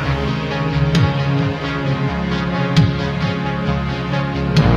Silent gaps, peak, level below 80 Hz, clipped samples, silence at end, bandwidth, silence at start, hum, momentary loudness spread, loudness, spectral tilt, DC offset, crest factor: none; -2 dBFS; -30 dBFS; under 0.1%; 0 s; 7.8 kHz; 0 s; none; 5 LU; -18 LUFS; -7 dB/octave; under 0.1%; 16 dB